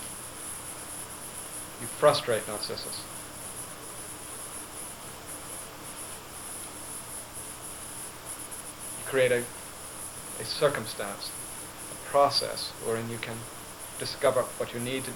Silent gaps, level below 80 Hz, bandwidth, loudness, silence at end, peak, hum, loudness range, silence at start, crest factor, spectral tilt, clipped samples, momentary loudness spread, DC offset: none; -60 dBFS; 19 kHz; -32 LUFS; 0 s; -10 dBFS; none; 9 LU; 0 s; 24 dB; -2.5 dB/octave; under 0.1%; 14 LU; 0.1%